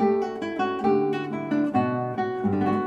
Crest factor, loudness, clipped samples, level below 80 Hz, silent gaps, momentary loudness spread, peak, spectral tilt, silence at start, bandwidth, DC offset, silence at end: 14 dB; -25 LUFS; under 0.1%; -62 dBFS; none; 5 LU; -10 dBFS; -8 dB/octave; 0 s; 7.6 kHz; under 0.1%; 0 s